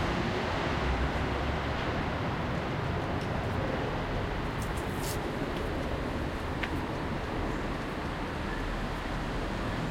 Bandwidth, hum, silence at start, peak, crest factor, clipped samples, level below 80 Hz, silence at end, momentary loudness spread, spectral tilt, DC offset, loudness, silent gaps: 16.5 kHz; none; 0 s; -14 dBFS; 18 dB; under 0.1%; -40 dBFS; 0 s; 4 LU; -6 dB/octave; under 0.1%; -33 LUFS; none